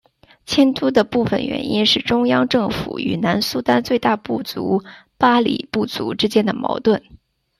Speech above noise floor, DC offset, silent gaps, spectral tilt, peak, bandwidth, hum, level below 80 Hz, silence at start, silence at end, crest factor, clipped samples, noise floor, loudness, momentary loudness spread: 19 dB; under 0.1%; none; -5 dB/octave; -2 dBFS; 14.5 kHz; none; -50 dBFS; 0.5 s; 0.45 s; 16 dB; under 0.1%; -37 dBFS; -18 LUFS; 7 LU